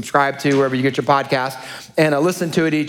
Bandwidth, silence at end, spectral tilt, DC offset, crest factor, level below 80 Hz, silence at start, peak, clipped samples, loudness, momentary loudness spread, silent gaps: 18 kHz; 0 s; -5.5 dB/octave; under 0.1%; 18 dB; -60 dBFS; 0 s; 0 dBFS; under 0.1%; -18 LUFS; 7 LU; none